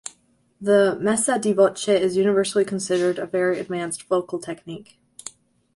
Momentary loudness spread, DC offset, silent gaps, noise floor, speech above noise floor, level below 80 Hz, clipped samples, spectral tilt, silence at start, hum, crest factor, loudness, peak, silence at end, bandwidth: 20 LU; under 0.1%; none; -60 dBFS; 39 dB; -64 dBFS; under 0.1%; -4.5 dB/octave; 0.05 s; none; 18 dB; -21 LUFS; -6 dBFS; 0.45 s; 11.5 kHz